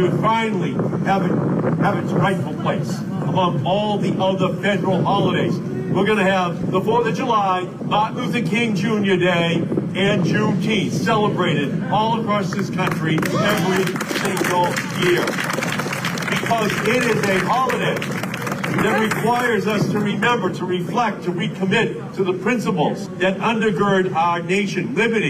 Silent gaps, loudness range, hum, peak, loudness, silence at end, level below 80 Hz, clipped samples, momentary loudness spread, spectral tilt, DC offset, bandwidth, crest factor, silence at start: none; 1 LU; none; -8 dBFS; -19 LUFS; 0 s; -52 dBFS; under 0.1%; 5 LU; -5.5 dB/octave; under 0.1%; 16 kHz; 12 dB; 0 s